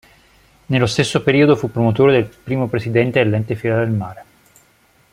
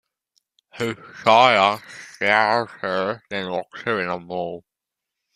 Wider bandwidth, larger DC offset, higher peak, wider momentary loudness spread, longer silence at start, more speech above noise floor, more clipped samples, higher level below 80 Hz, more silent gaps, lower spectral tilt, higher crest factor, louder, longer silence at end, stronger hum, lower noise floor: about the same, 14 kHz vs 14.5 kHz; neither; about the same, -2 dBFS vs -2 dBFS; second, 8 LU vs 14 LU; about the same, 0.7 s vs 0.75 s; second, 39 dB vs 64 dB; neither; first, -50 dBFS vs -66 dBFS; neither; first, -6.5 dB/octave vs -4 dB/octave; second, 16 dB vs 22 dB; first, -17 LUFS vs -21 LUFS; first, 0.9 s vs 0.75 s; neither; second, -55 dBFS vs -85 dBFS